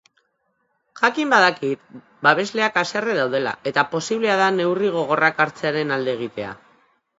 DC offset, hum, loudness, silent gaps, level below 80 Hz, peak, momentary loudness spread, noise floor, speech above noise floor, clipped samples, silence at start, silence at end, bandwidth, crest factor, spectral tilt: under 0.1%; none; -20 LUFS; none; -68 dBFS; 0 dBFS; 10 LU; -70 dBFS; 49 dB; under 0.1%; 0.95 s; 0.65 s; 8 kHz; 22 dB; -4.5 dB/octave